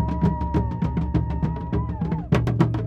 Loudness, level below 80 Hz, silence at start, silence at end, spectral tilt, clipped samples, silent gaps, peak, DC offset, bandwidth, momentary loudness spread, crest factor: -24 LUFS; -30 dBFS; 0 s; 0 s; -9 dB/octave; under 0.1%; none; -4 dBFS; under 0.1%; 7.8 kHz; 5 LU; 18 dB